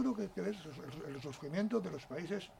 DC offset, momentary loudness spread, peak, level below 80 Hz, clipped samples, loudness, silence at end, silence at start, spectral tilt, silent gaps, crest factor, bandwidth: under 0.1%; 10 LU; -24 dBFS; -68 dBFS; under 0.1%; -41 LUFS; 0 s; 0 s; -6.5 dB/octave; none; 16 dB; 16 kHz